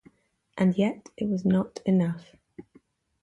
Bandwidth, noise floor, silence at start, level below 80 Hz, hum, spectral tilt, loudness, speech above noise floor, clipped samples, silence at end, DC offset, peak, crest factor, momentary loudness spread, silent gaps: 8 kHz; -62 dBFS; 0.55 s; -62 dBFS; none; -8.5 dB/octave; -26 LUFS; 37 dB; under 0.1%; 0.6 s; under 0.1%; -12 dBFS; 16 dB; 10 LU; none